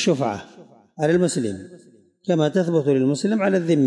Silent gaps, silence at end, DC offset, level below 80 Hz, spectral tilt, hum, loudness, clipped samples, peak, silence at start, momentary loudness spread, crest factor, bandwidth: none; 0 s; under 0.1%; -64 dBFS; -6 dB/octave; none; -21 LUFS; under 0.1%; -8 dBFS; 0 s; 11 LU; 14 dB; 11.5 kHz